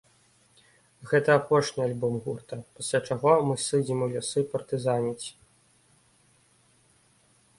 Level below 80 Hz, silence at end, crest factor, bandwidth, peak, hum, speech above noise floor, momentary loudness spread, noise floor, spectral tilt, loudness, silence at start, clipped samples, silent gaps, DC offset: -66 dBFS; 2.3 s; 22 dB; 11.5 kHz; -6 dBFS; none; 37 dB; 13 LU; -63 dBFS; -5 dB/octave; -27 LUFS; 1 s; under 0.1%; none; under 0.1%